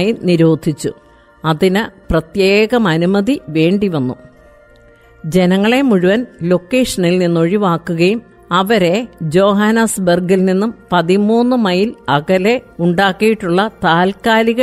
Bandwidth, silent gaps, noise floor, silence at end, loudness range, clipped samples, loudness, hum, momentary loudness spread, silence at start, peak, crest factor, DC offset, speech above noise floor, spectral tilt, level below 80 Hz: 15 kHz; none; -44 dBFS; 0 s; 2 LU; under 0.1%; -14 LUFS; none; 6 LU; 0 s; 0 dBFS; 12 dB; under 0.1%; 31 dB; -6 dB/octave; -42 dBFS